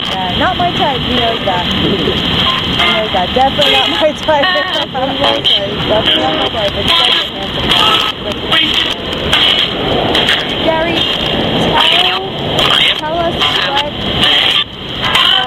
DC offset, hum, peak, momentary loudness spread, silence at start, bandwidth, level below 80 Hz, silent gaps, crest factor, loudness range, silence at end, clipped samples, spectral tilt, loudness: under 0.1%; none; 0 dBFS; 7 LU; 0 s; 17 kHz; -32 dBFS; none; 12 dB; 1 LU; 0 s; under 0.1%; -4 dB/octave; -11 LUFS